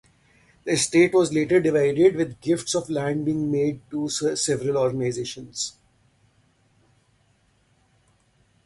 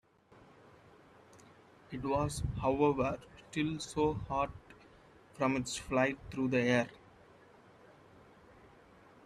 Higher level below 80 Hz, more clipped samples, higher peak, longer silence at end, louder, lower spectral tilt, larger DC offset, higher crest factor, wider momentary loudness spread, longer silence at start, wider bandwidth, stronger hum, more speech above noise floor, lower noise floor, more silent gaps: about the same, -60 dBFS vs -56 dBFS; neither; first, -6 dBFS vs -16 dBFS; first, 2.95 s vs 2.3 s; first, -23 LUFS vs -34 LUFS; about the same, -4.5 dB/octave vs -5.5 dB/octave; neither; about the same, 18 dB vs 22 dB; about the same, 12 LU vs 12 LU; second, 0.65 s vs 1.35 s; second, 11.5 kHz vs 13.5 kHz; neither; first, 41 dB vs 29 dB; about the same, -64 dBFS vs -62 dBFS; neither